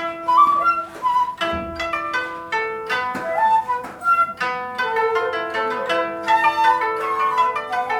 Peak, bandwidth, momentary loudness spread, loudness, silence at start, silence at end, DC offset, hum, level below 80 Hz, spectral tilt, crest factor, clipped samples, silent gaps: -4 dBFS; 18 kHz; 8 LU; -20 LUFS; 0 s; 0 s; under 0.1%; none; -52 dBFS; -3.5 dB/octave; 16 dB; under 0.1%; none